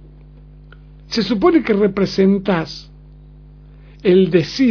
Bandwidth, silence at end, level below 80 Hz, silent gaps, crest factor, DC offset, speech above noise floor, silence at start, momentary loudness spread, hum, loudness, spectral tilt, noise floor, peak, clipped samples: 5.4 kHz; 0 s; -42 dBFS; none; 16 dB; under 0.1%; 26 dB; 1.1 s; 9 LU; 50 Hz at -40 dBFS; -16 LUFS; -7 dB/octave; -41 dBFS; -2 dBFS; under 0.1%